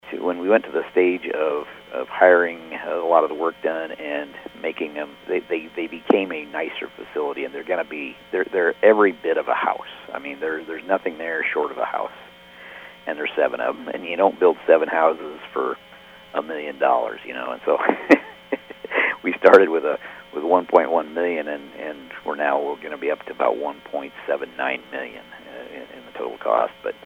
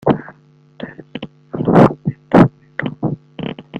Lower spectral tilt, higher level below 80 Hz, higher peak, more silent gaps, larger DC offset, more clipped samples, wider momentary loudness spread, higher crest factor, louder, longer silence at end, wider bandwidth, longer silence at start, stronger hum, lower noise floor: second, -5.5 dB/octave vs -9 dB/octave; second, -64 dBFS vs -46 dBFS; about the same, 0 dBFS vs 0 dBFS; neither; neither; neither; second, 15 LU vs 21 LU; first, 22 dB vs 16 dB; second, -22 LUFS vs -15 LUFS; first, 0.15 s vs 0 s; about the same, 8.4 kHz vs 8.2 kHz; about the same, 0.05 s vs 0.05 s; neither; about the same, -45 dBFS vs -47 dBFS